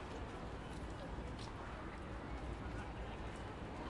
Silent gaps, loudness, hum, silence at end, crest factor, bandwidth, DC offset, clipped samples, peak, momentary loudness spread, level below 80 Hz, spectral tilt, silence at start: none; -48 LUFS; none; 0 s; 14 dB; 11.5 kHz; under 0.1%; under 0.1%; -34 dBFS; 2 LU; -52 dBFS; -6 dB/octave; 0 s